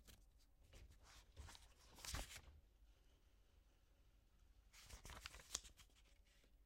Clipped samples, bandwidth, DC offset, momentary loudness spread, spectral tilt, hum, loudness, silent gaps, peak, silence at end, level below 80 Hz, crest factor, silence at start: under 0.1%; 16 kHz; under 0.1%; 17 LU; -1.5 dB/octave; none; -56 LUFS; none; -22 dBFS; 0 s; -66 dBFS; 40 dB; 0 s